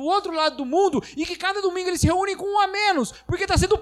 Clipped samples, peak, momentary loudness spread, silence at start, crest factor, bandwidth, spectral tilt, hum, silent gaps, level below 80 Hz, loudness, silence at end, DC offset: under 0.1%; -8 dBFS; 6 LU; 0 s; 14 dB; 14 kHz; -4.5 dB/octave; none; none; -36 dBFS; -22 LUFS; 0 s; under 0.1%